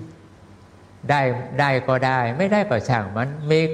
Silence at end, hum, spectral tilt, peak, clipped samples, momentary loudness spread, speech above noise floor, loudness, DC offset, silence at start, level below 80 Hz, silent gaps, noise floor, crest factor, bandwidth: 0 s; none; -7 dB/octave; -4 dBFS; under 0.1%; 7 LU; 27 dB; -21 LUFS; under 0.1%; 0 s; -56 dBFS; none; -47 dBFS; 16 dB; 10 kHz